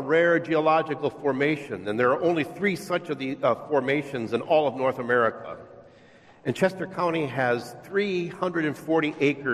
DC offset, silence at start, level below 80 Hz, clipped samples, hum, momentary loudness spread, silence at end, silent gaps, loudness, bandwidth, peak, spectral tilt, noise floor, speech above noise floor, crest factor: under 0.1%; 0 s; -66 dBFS; under 0.1%; none; 8 LU; 0 s; none; -25 LUFS; 14 kHz; -8 dBFS; -6.5 dB/octave; -53 dBFS; 28 dB; 18 dB